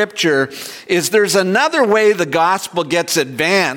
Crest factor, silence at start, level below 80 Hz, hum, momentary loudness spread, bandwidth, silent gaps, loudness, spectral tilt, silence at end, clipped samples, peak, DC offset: 12 dB; 0 s; -62 dBFS; none; 6 LU; 17 kHz; none; -15 LUFS; -3.5 dB/octave; 0 s; under 0.1%; -2 dBFS; under 0.1%